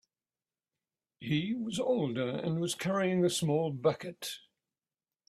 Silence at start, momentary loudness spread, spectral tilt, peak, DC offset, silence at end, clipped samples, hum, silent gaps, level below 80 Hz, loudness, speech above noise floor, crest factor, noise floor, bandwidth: 1.2 s; 12 LU; -5.5 dB/octave; -14 dBFS; under 0.1%; 0.9 s; under 0.1%; none; none; -72 dBFS; -32 LUFS; over 58 dB; 18 dB; under -90 dBFS; 14.5 kHz